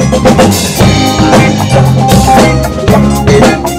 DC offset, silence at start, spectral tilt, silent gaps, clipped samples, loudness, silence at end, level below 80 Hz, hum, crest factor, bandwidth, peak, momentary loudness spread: under 0.1%; 0 s; -5.5 dB/octave; none; 2%; -6 LUFS; 0 s; -20 dBFS; none; 6 dB; 16.5 kHz; 0 dBFS; 2 LU